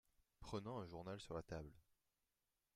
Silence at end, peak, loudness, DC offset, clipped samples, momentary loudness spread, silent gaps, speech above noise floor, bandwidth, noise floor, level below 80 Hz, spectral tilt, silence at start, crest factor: 0.95 s; -34 dBFS; -52 LUFS; under 0.1%; under 0.1%; 9 LU; none; over 39 dB; 15 kHz; under -90 dBFS; -70 dBFS; -6 dB/octave; 0.4 s; 20 dB